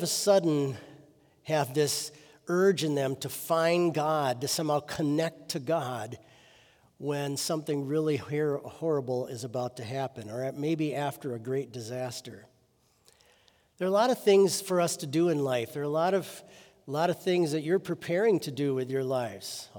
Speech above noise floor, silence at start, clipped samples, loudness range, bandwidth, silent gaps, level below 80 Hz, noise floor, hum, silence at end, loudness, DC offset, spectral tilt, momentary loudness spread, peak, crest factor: 39 dB; 0 s; under 0.1%; 6 LU; over 20 kHz; none; -74 dBFS; -68 dBFS; none; 0 s; -29 LUFS; under 0.1%; -5 dB/octave; 11 LU; -10 dBFS; 18 dB